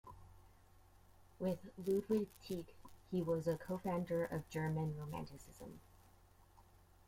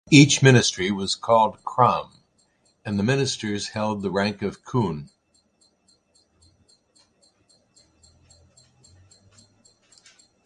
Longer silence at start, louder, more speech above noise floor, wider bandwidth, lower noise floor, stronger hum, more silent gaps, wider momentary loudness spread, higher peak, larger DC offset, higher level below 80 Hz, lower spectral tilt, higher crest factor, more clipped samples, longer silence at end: about the same, 0.05 s vs 0.1 s; second, -42 LUFS vs -21 LUFS; second, 25 dB vs 44 dB; first, 16.5 kHz vs 11 kHz; about the same, -66 dBFS vs -65 dBFS; neither; neither; first, 18 LU vs 14 LU; second, -26 dBFS vs 0 dBFS; neither; second, -66 dBFS vs -56 dBFS; first, -7.5 dB/octave vs -4.5 dB/octave; second, 18 dB vs 24 dB; neither; second, 0.45 s vs 5.4 s